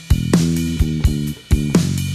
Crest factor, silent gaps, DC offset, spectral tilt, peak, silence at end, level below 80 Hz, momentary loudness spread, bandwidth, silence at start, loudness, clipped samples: 14 dB; none; under 0.1%; -6 dB/octave; -2 dBFS; 0 s; -22 dBFS; 4 LU; 15 kHz; 0 s; -18 LUFS; under 0.1%